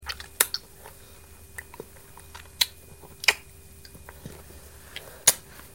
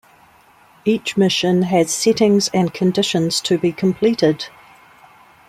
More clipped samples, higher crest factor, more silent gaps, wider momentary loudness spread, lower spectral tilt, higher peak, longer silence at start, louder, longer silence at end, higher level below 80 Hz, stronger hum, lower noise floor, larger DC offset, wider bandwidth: neither; first, 32 dB vs 16 dB; neither; first, 26 LU vs 5 LU; second, 0.5 dB/octave vs -5 dB/octave; about the same, 0 dBFS vs -2 dBFS; second, 0 s vs 0.85 s; second, -25 LUFS vs -17 LUFS; second, 0.1 s vs 1 s; about the same, -54 dBFS vs -58 dBFS; neither; about the same, -49 dBFS vs -50 dBFS; first, 0.2% vs under 0.1%; first, 19.5 kHz vs 15 kHz